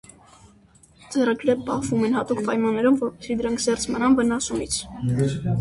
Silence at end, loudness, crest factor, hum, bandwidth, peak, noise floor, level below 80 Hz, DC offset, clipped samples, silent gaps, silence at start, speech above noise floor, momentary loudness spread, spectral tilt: 0 s; -23 LUFS; 16 dB; none; 11.5 kHz; -8 dBFS; -54 dBFS; -50 dBFS; under 0.1%; under 0.1%; none; 1.1 s; 32 dB; 6 LU; -5.5 dB/octave